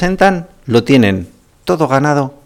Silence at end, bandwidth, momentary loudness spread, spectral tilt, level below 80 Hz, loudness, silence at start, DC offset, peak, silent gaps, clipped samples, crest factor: 0.15 s; 16 kHz; 11 LU; -6.5 dB/octave; -38 dBFS; -13 LUFS; 0 s; under 0.1%; 0 dBFS; none; under 0.1%; 14 dB